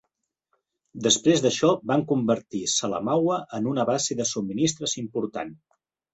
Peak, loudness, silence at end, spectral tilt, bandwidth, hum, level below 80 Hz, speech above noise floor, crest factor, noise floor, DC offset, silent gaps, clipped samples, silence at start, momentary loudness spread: -6 dBFS; -24 LUFS; 0.6 s; -4 dB/octave; 8.2 kHz; none; -64 dBFS; 56 dB; 18 dB; -80 dBFS; under 0.1%; none; under 0.1%; 0.95 s; 9 LU